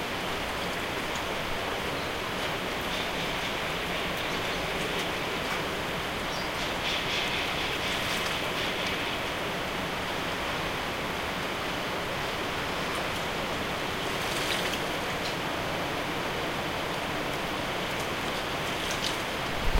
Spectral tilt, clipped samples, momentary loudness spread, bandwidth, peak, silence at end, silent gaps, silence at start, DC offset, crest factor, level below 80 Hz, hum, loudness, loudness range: -3.5 dB/octave; under 0.1%; 3 LU; 16 kHz; -12 dBFS; 0 s; none; 0 s; under 0.1%; 20 dB; -44 dBFS; none; -30 LUFS; 2 LU